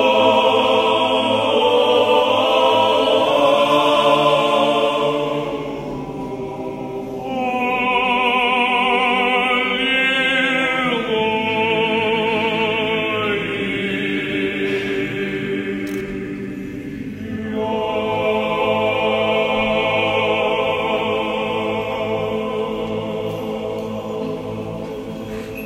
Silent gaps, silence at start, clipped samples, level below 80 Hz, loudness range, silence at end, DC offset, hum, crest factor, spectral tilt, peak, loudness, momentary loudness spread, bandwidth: none; 0 s; under 0.1%; -48 dBFS; 8 LU; 0 s; under 0.1%; none; 16 dB; -5 dB/octave; -2 dBFS; -18 LUFS; 13 LU; 16 kHz